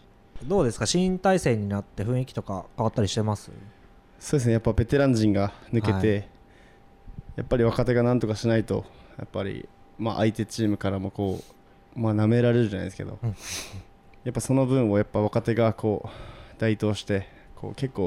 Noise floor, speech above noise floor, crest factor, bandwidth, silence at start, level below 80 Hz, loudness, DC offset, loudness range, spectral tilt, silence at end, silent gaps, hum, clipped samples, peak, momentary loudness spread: -53 dBFS; 28 dB; 16 dB; 14 kHz; 0.35 s; -46 dBFS; -26 LUFS; under 0.1%; 3 LU; -6.5 dB/octave; 0 s; none; none; under 0.1%; -10 dBFS; 18 LU